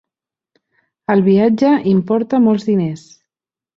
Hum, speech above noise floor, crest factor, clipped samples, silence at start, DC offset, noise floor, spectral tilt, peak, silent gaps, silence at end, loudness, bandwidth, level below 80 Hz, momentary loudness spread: none; 75 dB; 14 dB; under 0.1%; 1.1 s; under 0.1%; -89 dBFS; -8.5 dB/octave; -2 dBFS; none; 0.8 s; -14 LUFS; 7.6 kHz; -58 dBFS; 10 LU